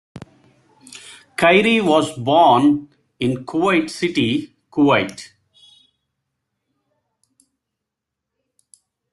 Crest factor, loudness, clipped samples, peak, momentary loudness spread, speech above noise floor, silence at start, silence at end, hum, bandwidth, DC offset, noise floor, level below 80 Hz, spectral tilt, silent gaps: 18 dB; -17 LUFS; under 0.1%; -2 dBFS; 18 LU; 66 dB; 0.15 s; 3.85 s; none; 12 kHz; under 0.1%; -82 dBFS; -60 dBFS; -5.5 dB/octave; none